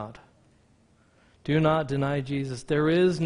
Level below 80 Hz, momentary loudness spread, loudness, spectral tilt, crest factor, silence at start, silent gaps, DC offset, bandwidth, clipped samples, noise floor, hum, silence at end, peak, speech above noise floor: -56 dBFS; 11 LU; -26 LUFS; -7 dB/octave; 18 dB; 0 s; none; under 0.1%; 10.5 kHz; under 0.1%; -62 dBFS; none; 0 s; -10 dBFS; 37 dB